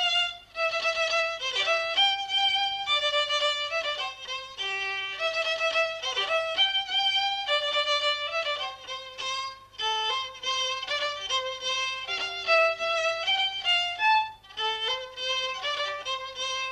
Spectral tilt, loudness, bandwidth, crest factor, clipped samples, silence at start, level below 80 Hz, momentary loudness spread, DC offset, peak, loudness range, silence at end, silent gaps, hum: 1 dB/octave; -26 LUFS; 13.5 kHz; 18 dB; under 0.1%; 0 s; -66 dBFS; 9 LU; under 0.1%; -10 dBFS; 4 LU; 0 s; none; none